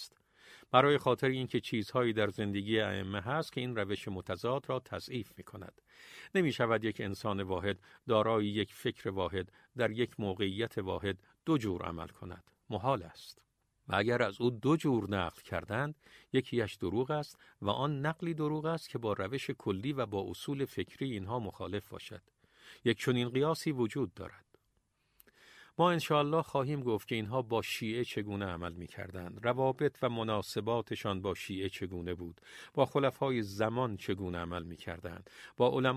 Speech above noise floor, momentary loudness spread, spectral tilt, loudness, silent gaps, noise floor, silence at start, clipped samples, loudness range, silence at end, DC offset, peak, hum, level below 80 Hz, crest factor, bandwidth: 43 dB; 14 LU; -6 dB/octave; -35 LUFS; none; -77 dBFS; 0 s; under 0.1%; 4 LU; 0 s; under 0.1%; -10 dBFS; none; -58 dBFS; 24 dB; 15.5 kHz